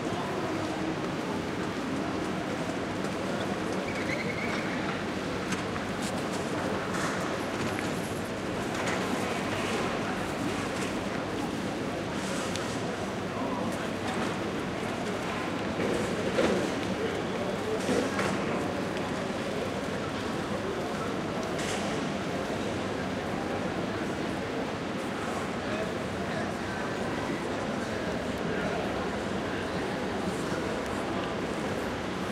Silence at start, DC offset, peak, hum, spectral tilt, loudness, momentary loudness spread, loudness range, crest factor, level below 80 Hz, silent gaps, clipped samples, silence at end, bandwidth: 0 s; under 0.1%; -14 dBFS; none; -5 dB/octave; -31 LUFS; 3 LU; 2 LU; 18 dB; -52 dBFS; none; under 0.1%; 0 s; 16 kHz